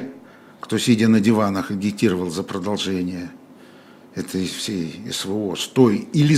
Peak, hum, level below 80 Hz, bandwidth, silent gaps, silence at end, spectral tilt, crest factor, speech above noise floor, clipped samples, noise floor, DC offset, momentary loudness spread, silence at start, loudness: -2 dBFS; none; -62 dBFS; 15.5 kHz; none; 0 s; -5.5 dB/octave; 18 dB; 26 dB; under 0.1%; -46 dBFS; under 0.1%; 15 LU; 0 s; -21 LUFS